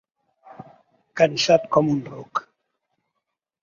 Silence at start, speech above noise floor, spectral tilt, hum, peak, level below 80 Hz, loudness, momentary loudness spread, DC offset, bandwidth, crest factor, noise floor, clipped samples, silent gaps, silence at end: 0.6 s; 61 dB; -5 dB/octave; none; -2 dBFS; -64 dBFS; -21 LUFS; 13 LU; under 0.1%; 7.6 kHz; 22 dB; -81 dBFS; under 0.1%; none; 1.2 s